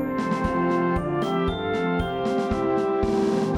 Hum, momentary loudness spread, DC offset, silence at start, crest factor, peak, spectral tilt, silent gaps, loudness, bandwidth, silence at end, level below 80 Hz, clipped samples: none; 3 LU; under 0.1%; 0 s; 14 dB; -10 dBFS; -7 dB/octave; none; -24 LUFS; 16 kHz; 0 s; -40 dBFS; under 0.1%